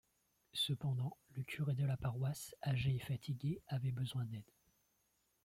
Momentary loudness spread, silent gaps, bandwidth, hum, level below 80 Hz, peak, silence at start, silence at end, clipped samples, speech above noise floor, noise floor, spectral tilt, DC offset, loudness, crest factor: 8 LU; none; 15.5 kHz; none; -66 dBFS; -28 dBFS; 0.55 s; 1 s; under 0.1%; 40 dB; -80 dBFS; -5.5 dB/octave; under 0.1%; -41 LUFS; 14 dB